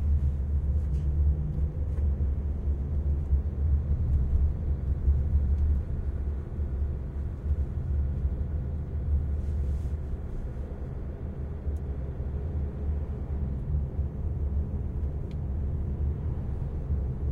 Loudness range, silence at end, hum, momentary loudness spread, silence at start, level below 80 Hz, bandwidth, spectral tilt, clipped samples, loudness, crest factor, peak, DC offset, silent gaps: 6 LU; 0 s; none; 7 LU; 0 s; -30 dBFS; 2.4 kHz; -11 dB/octave; under 0.1%; -31 LUFS; 14 dB; -14 dBFS; under 0.1%; none